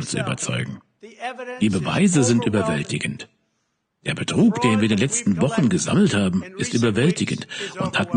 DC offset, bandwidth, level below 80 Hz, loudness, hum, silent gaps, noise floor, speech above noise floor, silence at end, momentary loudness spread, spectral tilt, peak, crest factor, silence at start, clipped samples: under 0.1%; 10 kHz; -54 dBFS; -21 LUFS; none; none; -73 dBFS; 52 dB; 0 s; 13 LU; -5 dB/octave; -4 dBFS; 16 dB; 0 s; under 0.1%